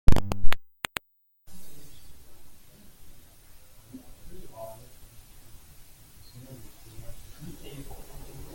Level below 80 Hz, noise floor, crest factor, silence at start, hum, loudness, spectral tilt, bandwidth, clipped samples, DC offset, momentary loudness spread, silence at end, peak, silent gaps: -34 dBFS; -64 dBFS; 22 dB; 0.1 s; none; -39 LUFS; -5 dB/octave; 17 kHz; under 0.1%; under 0.1%; 20 LU; 1.45 s; -2 dBFS; none